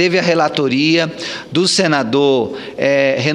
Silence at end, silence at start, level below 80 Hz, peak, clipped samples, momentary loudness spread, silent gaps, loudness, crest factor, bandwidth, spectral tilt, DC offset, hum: 0 s; 0 s; -58 dBFS; 0 dBFS; under 0.1%; 7 LU; none; -15 LUFS; 14 dB; 11.5 kHz; -4.5 dB/octave; under 0.1%; none